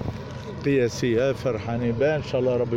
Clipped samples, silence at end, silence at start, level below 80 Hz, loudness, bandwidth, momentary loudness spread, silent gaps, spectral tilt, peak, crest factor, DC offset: under 0.1%; 0 s; 0 s; -48 dBFS; -24 LUFS; 15.5 kHz; 9 LU; none; -6.5 dB/octave; -10 dBFS; 14 dB; under 0.1%